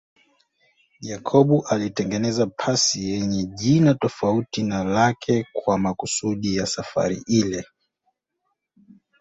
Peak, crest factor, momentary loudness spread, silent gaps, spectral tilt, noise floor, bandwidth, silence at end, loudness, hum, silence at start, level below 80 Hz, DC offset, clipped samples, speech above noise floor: -2 dBFS; 20 dB; 7 LU; none; -5 dB/octave; -76 dBFS; 8.4 kHz; 1.55 s; -22 LUFS; none; 1 s; -54 dBFS; under 0.1%; under 0.1%; 55 dB